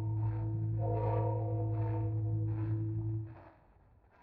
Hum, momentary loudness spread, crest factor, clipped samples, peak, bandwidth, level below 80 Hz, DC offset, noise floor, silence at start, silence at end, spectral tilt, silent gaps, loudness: none; 6 LU; 14 dB; under 0.1%; -22 dBFS; 2.8 kHz; -52 dBFS; under 0.1%; -64 dBFS; 0 s; 0.75 s; -11.5 dB/octave; none; -35 LUFS